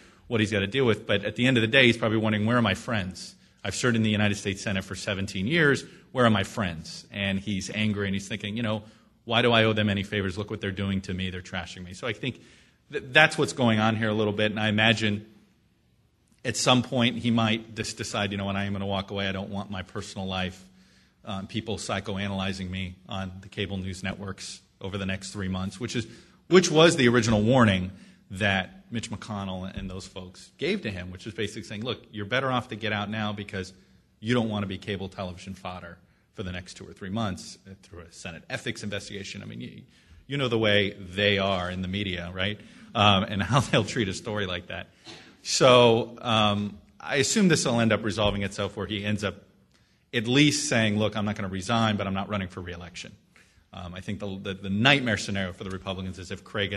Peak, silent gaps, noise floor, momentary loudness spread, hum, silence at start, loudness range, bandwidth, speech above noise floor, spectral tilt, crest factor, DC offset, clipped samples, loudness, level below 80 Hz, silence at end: -2 dBFS; none; -65 dBFS; 17 LU; none; 0.3 s; 10 LU; 12.5 kHz; 39 dB; -4.5 dB/octave; 26 dB; under 0.1%; under 0.1%; -26 LUFS; -54 dBFS; 0 s